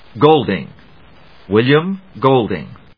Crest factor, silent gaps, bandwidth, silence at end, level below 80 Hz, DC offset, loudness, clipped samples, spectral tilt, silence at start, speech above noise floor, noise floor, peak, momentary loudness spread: 16 dB; none; 5.4 kHz; 0.25 s; -52 dBFS; 0.4%; -15 LUFS; under 0.1%; -9.5 dB/octave; 0.15 s; 31 dB; -45 dBFS; 0 dBFS; 13 LU